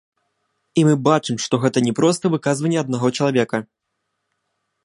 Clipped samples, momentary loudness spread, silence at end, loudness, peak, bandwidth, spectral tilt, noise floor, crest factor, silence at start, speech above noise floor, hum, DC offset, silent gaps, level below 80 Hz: under 0.1%; 5 LU; 1.2 s; -19 LUFS; -2 dBFS; 11.5 kHz; -5.5 dB/octave; -76 dBFS; 18 dB; 0.75 s; 58 dB; none; under 0.1%; none; -64 dBFS